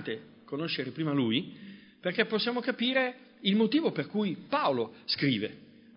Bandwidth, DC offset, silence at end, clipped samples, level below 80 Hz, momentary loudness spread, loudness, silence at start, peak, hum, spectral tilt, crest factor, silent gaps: 5.6 kHz; under 0.1%; 0.35 s; under 0.1%; -76 dBFS; 12 LU; -30 LUFS; 0 s; -10 dBFS; none; -9.5 dB/octave; 20 dB; none